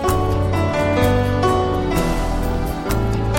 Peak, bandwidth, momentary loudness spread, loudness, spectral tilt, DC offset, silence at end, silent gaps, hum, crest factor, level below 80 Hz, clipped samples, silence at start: -6 dBFS; 16.5 kHz; 5 LU; -19 LUFS; -6.5 dB/octave; under 0.1%; 0 s; none; none; 12 dB; -26 dBFS; under 0.1%; 0 s